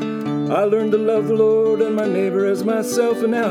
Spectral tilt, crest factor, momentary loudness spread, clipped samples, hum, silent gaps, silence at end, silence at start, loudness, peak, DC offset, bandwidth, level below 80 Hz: -6 dB/octave; 12 dB; 4 LU; under 0.1%; none; none; 0 s; 0 s; -18 LUFS; -6 dBFS; under 0.1%; 16 kHz; -68 dBFS